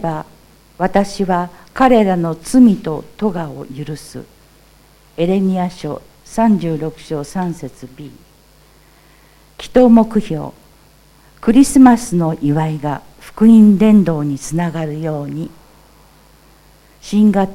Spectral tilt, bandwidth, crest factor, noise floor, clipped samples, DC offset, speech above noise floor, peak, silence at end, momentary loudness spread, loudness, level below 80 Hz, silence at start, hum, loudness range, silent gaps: -7 dB/octave; 14.5 kHz; 16 dB; -48 dBFS; under 0.1%; under 0.1%; 34 dB; 0 dBFS; 0 s; 19 LU; -14 LUFS; -42 dBFS; 0 s; none; 9 LU; none